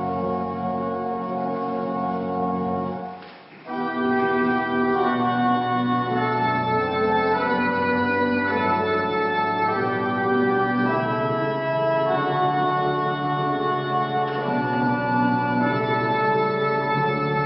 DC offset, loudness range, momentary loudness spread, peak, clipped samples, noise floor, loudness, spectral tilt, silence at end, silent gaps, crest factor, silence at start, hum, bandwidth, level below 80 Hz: under 0.1%; 4 LU; 5 LU; -10 dBFS; under 0.1%; -42 dBFS; -22 LUFS; -11 dB/octave; 0 s; none; 14 dB; 0 s; none; 5.6 kHz; -60 dBFS